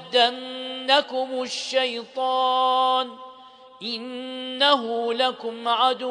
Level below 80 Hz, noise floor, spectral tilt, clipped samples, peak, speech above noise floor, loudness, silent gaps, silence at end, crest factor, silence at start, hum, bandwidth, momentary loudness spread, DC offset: -80 dBFS; -47 dBFS; -1.5 dB/octave; under 0.1%; -4 dBFS; 24 dB; -23 LUFS; none; 0 s; 20 dB; 0 s; none; 10.5 kHz; 12 LU; under 0.1%